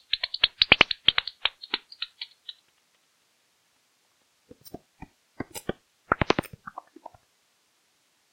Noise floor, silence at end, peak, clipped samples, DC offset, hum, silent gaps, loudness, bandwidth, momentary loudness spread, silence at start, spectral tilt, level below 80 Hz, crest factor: -69 dBFS; 1.85 s; 0 dBFS; under 0.1%; under 0.1%; none; none; -24 LUFS; 16 kHz; 28 LU; 0.15 s; -3 dB/octave; -52 dBFS; 30 dB